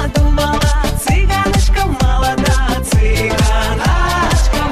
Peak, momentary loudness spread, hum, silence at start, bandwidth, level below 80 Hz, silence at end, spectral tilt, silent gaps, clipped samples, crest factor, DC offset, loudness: -2 dBFS; 1 LU; none; 0 s; 14.5 kHz; -14 dBFS; 0 s; -5 dB/octave; none; under 0.1%; 10 dB; under 0.1%; -14 LUFS